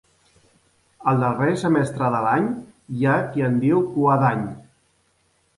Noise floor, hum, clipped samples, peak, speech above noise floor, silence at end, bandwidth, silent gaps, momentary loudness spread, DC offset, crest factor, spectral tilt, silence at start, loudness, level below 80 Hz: -65 dBFS; none; under 0.1%; -6 dBFS; 45 dB; 0.95 s; 11.5 kHz; none; 10 LU; under 0.1%; 16 dB; -8 dB/octave; 1 s; -21 LUFS; -58 dBFS